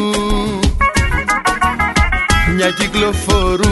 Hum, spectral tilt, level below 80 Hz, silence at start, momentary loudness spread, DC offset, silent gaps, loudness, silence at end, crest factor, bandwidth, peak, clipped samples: none; -4.5 dB/octave; -20 dBFS; 0 s; 3 LU; 0.1%; none; -14 LUFS; 0 s; 14 dB; 12 kHz; 0 dBFS; under 0.1%